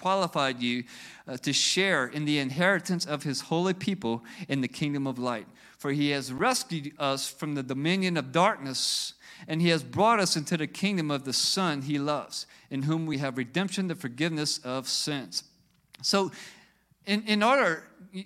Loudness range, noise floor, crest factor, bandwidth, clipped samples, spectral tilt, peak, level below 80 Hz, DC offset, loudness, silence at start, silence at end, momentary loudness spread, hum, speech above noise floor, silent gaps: 4 LU; -60 dBFS; 20 dB; 15.5 kHz; under 0.1%; -4 dB/octave; -8 dBFS; -72 dBFS; under 0.1%; -28 LUFS; 0 s; 0 s; 11 LU; none; 32 dB; none